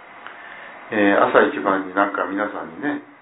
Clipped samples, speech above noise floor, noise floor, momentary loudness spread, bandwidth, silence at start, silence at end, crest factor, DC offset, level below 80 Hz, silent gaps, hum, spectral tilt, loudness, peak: under 0.1%; 20 dB; -39 dBFS; 21 LU; 4 kHz; 0 s; 0.2 s; 20 dB; under 0.1%; -66 dBFS; none; none; -9.5 dB/octave; -20 LUFS; 0 dBFS